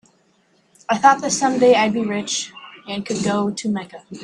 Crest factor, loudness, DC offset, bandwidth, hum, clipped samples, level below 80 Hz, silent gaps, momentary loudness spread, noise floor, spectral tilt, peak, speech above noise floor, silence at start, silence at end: 20 dB; -19 LUFS; under 0.1%; 11 kHz; none; under 0.1%; -62 dBFS; none; 17 LU; -60 dBFS; -3.5 dB/octave; 0 dBFS; 41 dB; 0.9 s; 0 s